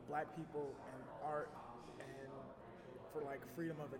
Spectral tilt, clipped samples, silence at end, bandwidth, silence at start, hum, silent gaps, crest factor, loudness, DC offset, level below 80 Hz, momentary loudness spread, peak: -7 dB/octave; under 0.1%; 0 s; 17 kHz; 0 s; none; none; 18 dB; -49 LUFS; under 0.1%; -74 dBFS; 10 LU; -30 dBFS